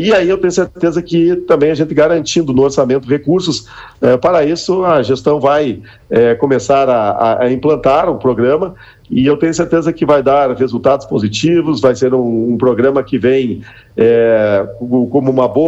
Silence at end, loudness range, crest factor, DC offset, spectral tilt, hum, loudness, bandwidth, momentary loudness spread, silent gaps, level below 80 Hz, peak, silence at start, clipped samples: 0 s; 1 LU; 10 dB; under 0.1%; -6 dB/octave; none; -12 LUFS; 8.2 kHz; 5 LU; none; -44 dBFS; 0 dBFS; 0 s; under 0.1%